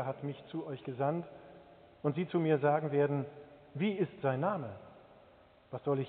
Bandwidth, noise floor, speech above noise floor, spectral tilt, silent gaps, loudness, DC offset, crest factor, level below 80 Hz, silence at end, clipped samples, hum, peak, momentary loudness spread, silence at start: 4.4 kHz; -62 dBFS; 28 dB; -7 dB/octave; none; -35 LUFS; under 0.1%; 20 dB; -74 dBFS; 0 s; under 0.1%; none; -16 dBFS; 19 LU; 0 s